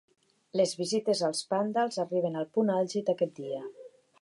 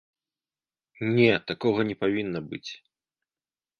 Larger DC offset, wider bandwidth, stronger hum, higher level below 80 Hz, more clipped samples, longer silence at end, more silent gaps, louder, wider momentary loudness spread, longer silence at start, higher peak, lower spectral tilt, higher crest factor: neither; first, 11.5 kHz vs 6.8 kHz; neither; second, -82 dBFS vs -64 dBFS; neither; second, 0.35 s vs 1.05 s; neither; second, -30 LUFS vs -25 LUFS; second, 9 LU vs 16 LU; second, 0.55 s vs 1 s; second, -14 dBFS vs -6 dBFS; second, -4.5 dB/octave vs -7 dB/octave; second, 16 dB vs 22 dB